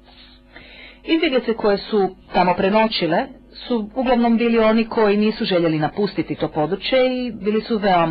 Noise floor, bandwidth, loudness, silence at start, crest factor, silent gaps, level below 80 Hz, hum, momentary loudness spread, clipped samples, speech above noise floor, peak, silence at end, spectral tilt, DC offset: -46 dBFS; 5.4 kHz; -19 LUFS; 0.55 s; 14 dB; none; -46 dBFS; none; 7 LU; under 0.1%; 28 dB; -6 dBFS; 0 s; -9.5 dB/octave; under 0.1%